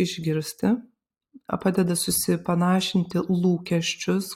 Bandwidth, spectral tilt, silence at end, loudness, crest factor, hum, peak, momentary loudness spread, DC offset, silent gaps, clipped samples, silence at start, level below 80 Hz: 16 kHz; -5 dB/octave; 0 s; -24 LUFS; 16 dB; none; -10 dBFS; 5 LU; under 0.1%; none; under 0.1%; 0 s; -58 dBFS